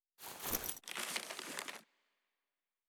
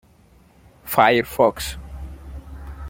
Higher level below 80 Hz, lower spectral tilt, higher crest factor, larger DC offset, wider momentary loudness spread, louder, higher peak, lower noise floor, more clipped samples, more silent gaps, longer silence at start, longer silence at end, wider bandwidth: second, -68 dBFS vs -40 dBFS; second, -0.5 dB/octave vs -4.5 dB/octave; first, 28 dB vs 22 dB; neither; second, 11 LU vs 22 LU; second, -42 LUFS vs -19 LUFS; second, -20 dBFS vs -2 dBFS; first, under -90 dBFS vs -53 dBFS; neither; neither; second, 0.2 s vs 0.85 s; first, 1.05 s vs 0 s; first, over 20 kHz vs 17 kHz